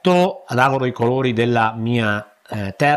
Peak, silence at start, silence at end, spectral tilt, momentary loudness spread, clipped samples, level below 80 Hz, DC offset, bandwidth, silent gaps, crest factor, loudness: -2 dBFS; 0.05 s; 0 s; -6.5 dB/octave; 10 LU; under 0.1%; -56 dBFS; under 0.1%; 12.5 kHz; none; 16 dB; -19 LUFS